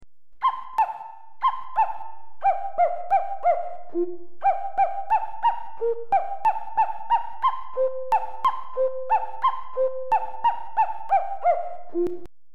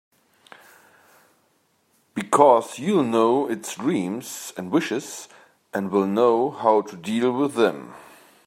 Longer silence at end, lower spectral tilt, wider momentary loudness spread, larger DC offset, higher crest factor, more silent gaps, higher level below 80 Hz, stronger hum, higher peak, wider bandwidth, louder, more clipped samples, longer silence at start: second, 0 s vs 0.45 s; about the same, -6 dB/octave vs -5.5 dB/octave; second, 6 LU vs 16 LU; first, 4% vs under 0.1%; second, 14 dB vs 22 dB; neither; first, -60 dBFS vs -74 dBFS; neither; second, -10 dBFS vs -2 dBFS; second, 9 kHz vs 16 kHz; second, -25 LUFS vs -22 LUFS; neither; second, 0 s vs 2.15 s